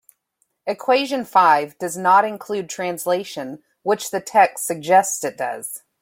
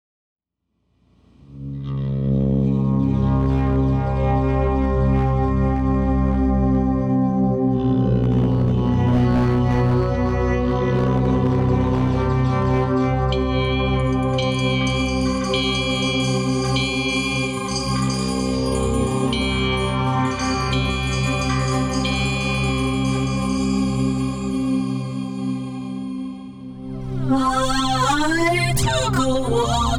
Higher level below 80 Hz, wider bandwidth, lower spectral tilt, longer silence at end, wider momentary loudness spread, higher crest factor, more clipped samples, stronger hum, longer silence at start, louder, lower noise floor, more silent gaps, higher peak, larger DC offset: second, -72 dBFS vs -28 dBFS; first, 16.5 kHz vs 14 kHz; second, -3 dB/octave vs -6 dB/octave; first, 0.25 s vs 0 s; first, 14 LU vs 5 LU; first, 18 dB vs 10 dB; neither; neither; second, 0.65 s vs 1.5 s; about the same, -19 LUFS vs -20 LUFS; about the same, -70 dBFS vs -72 dBFS; neither; first, -2 dBFS vs -10 dBFS; neither